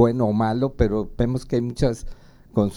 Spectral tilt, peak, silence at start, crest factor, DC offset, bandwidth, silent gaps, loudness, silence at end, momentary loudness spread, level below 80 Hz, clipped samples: -8 dB/octave; -4 dBFS; 0 s; 18 dB; under 0.1%; 12 kHz; none; -23 LUFS; 0 s; 4 LU; -34 dBFS; under 0.1%